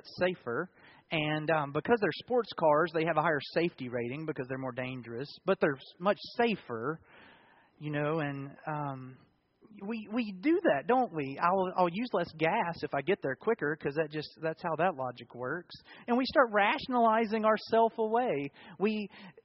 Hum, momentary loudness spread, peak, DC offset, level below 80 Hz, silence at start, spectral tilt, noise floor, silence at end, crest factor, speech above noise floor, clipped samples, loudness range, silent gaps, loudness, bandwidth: none; 12 LU; -10 dBFS; under 0.1%; -70 dBFS; 0.05 s; -4 dB/octave; -62 dBFS; 0.15 s; 22 dB; 30 dB; under 0.1%; 6 LU; none; -31 LUFS; 5.8 kHz